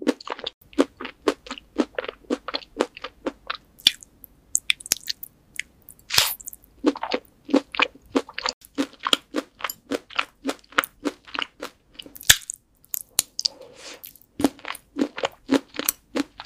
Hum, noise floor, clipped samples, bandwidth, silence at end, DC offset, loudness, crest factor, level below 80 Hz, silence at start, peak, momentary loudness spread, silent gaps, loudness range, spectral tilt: none; -52 dBFS; under 0.1%; 16 kHz; 0 s; under 0.1%; -25 LUFS; 28 dB; -56 dBFS; 0 s; 0 dBFS; 15 LU; 0.54-0.61 s, 8.54-8.61 s; 3 LU; -1 dB/octave